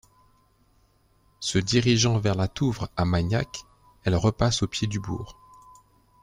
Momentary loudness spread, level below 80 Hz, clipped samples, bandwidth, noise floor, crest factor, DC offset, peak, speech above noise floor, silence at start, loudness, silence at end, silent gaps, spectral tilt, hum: 13 LU; -46 dBFS; under 0.1%; 10.5 kHz; -63 dBFS; 20 dB; under 0.1%; -6 dBFS; 39 dB; 1.4 s; -25 LUFS; 0.9 s; none; -5 dB/octave; none